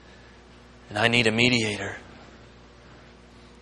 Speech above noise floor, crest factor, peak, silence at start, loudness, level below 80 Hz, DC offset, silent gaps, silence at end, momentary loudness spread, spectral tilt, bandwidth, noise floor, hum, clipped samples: 27 dB; 26 dB; -2 dBFS; 0.9 s; -22 LUFS; -54 dBFS; under 0.1%; none; 1.25 s; 15 LU; -4 dB/octave; 11.5 kHz; -50 dBFS; 60 Hz at -45 dBFS; under 0.1%